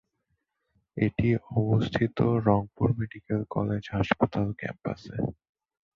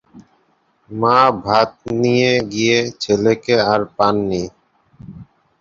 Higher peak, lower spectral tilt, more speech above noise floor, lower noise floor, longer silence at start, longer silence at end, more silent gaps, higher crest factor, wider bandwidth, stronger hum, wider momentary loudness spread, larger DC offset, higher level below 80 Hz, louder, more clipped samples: second, -6 dBFS vs 0 dBFS; first, -9 dB/octave vs -5 dB/octave; first, 51 dB vs 45 dB; first, -78 dBFS vs -60 dBFS; first, 0.95 s vs 0.15 s; first, 0.65 s vs 0.35 s; neither; first, 22 dB vs 16 dB; second, 6.8 kHz vs 7.6 kHz; neither; about the same, 9 LU vs 7 LU; neither; about the same, -50 dBFS vs -50 dBFS; second, -28 LUFS vs -16 LUFS; neither